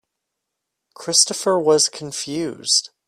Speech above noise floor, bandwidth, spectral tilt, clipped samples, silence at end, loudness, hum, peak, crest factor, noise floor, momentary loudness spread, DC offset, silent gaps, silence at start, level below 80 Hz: 60 dB; 15 kHz; -2 dB/octave; under 0.1%; 0.2 s; -18 LUFS; none; 0 dBFS; 22 dB; -80 dBFS; 11 LU; under 0.1%; none; 1 s; -68 dBFS